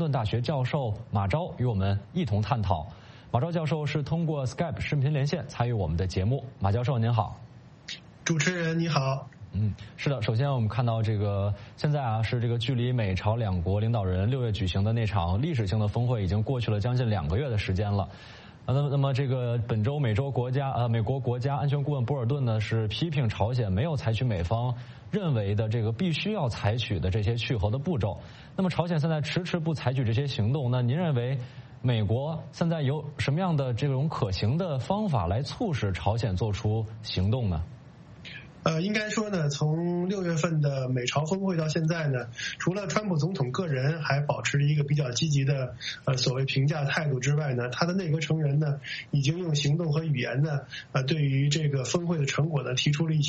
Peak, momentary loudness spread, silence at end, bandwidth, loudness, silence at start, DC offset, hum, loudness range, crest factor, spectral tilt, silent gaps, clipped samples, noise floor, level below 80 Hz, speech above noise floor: -8 dBFS; 5 LU; 0 s; 8.4 kHz; -28 LUFS; 0 s; under 0.1%; none; 2 LU; 20 dB; -6.5 dB/octave; none; under 0.1%; -48 dBFS; -50 dBFS; 21 dB